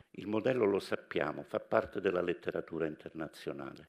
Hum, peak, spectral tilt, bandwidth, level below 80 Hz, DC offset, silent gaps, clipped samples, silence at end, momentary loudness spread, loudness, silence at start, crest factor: none; -12 dBFS; -6.5 dB/octave; 14 kHz; -68 dBFS; under 0.1%; none; under 0.1%; 0 s; 11 LU; -35 LUFS; 0.15 s; 24 dB